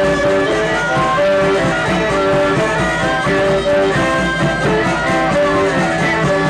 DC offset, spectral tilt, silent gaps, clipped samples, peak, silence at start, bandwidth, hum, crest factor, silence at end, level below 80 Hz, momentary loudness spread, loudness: under 0.1%; -5.5 dB/octave; none; under 0.1%; -6 dBFS; 0 s; 12.5 kHz; none; 8 dB; 0 s; -34 dBFS; 2 LU; -14 LUFS